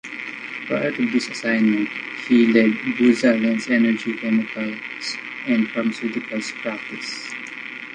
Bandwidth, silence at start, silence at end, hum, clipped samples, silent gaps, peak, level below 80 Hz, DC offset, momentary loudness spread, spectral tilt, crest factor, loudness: 9.8 kHz; 0.05 s; 0 s; none; under 0.1%; none; -2 dBFS; -66 dBFS; under 0.1%; 13 LU; -5 dB/octave; 18 dB; -21 LUFS